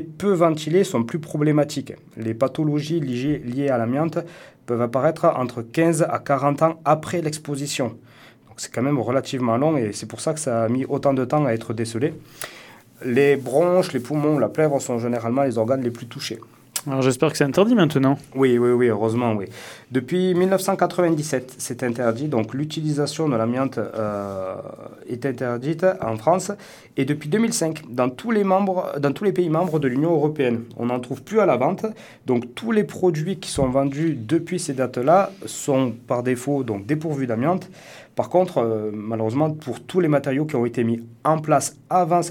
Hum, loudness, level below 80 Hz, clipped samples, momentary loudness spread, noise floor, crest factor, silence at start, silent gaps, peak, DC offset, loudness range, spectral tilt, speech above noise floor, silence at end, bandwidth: none; -22 LUFS; -58 dBFS; under 0.1%; 10 LU; -48 dBFS; 20 dB; 0 s; none; -2 dBFS; under 0.1%; 4 LU; -6 dB/octave; 27 dB; 0 s; 19 kHz